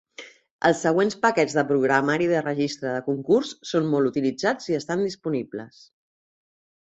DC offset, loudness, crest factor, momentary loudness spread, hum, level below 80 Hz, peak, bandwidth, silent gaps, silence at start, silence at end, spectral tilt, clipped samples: under 0.1%; -23 LUFS; 20 dB; 8 LU; none; -66 dBFS; -4 dBFS; 8.2 kHz; 0.51-0.59 s; 0.2 s; 1.15 s; -5.5 dB/octave; under 0.1%